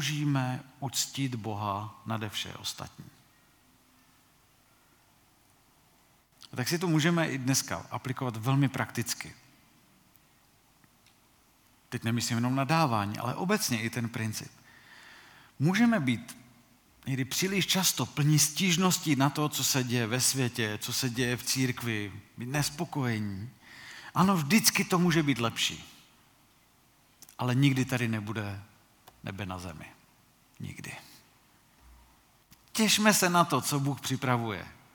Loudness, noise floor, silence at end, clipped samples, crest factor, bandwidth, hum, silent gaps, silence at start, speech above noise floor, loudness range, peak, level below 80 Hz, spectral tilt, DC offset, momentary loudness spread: -29 LUFS; -64 dBFS; 0.25 s; under 0.1%; 26 dB; 19 kHz; none; none; 0 s; 35 dB; 14 LU; -6 dBFS; -66 dBFS; -4 dB/octave; under 0.1%; 18 LU